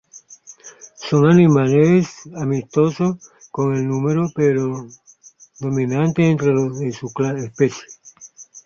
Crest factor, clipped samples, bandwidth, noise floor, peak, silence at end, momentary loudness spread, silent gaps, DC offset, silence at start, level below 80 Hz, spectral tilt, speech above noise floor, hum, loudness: 16 dB; under 0.1%; 7.2 kHz; -48 dBFS; -2 dBFS; 0.05 s; 19 LU; none; under 0.1%; 0.15 s; -56 dBFS; -7.5 dB/octave; 31 dB; none; -18 LUFS